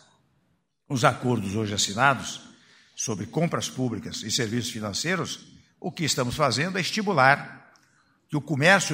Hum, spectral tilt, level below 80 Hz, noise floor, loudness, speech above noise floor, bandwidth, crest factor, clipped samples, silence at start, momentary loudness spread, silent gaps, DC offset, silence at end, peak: none; -4 dB/octave; -60 dBFS; -71 dBFS; -25 LUFS; 46 dB; 16 kHz; 24 dB; under 0.1%; 0.9 s; 13 LU; none; under 0.1%; 0 s; -2 dBFS